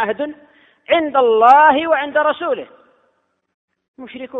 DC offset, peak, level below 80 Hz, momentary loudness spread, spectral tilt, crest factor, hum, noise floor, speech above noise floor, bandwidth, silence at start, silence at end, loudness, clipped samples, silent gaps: under 0.1%; 0 dBFS; -62 dBFS; 17 LU; -5 dB/octave; 16 dB; none; -65 dBFS; 50 dB; 6.6 kHz; 0 s; 0 s; -14 LUFS; under 0.1%; 3.54-3.68 s, 3.88-3.94 s